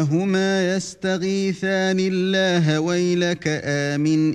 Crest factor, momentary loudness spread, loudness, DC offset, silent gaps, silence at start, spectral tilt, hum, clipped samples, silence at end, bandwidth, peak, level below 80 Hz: 12 dB; 4 LU; -21 LUFS; under 0.1%; none; 0 s; -5.5 dB/octave; none; under 0.1%; 0 s; 10 kHz; -8 dBFS; -60 dBFS